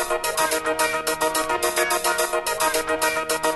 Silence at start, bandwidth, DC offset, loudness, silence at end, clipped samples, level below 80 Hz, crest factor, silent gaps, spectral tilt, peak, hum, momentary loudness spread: 0 s; 12.5 kHz; under 0.1%; -22 LUFS; 0 s; under 0.1%; -50 dBFS; 14 dB; none; -1 dB/octave; -8 dBFS; none; 2 LU